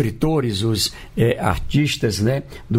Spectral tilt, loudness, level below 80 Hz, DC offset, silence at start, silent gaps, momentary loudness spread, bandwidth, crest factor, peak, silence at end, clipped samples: -5.5 dB/octave; -20 LUFS; -36 dBFS; under 0.1%; 0 s; none; 3 LU; 16 kHz; 14 dB; -6 dBFS; 0 s; under 0.1%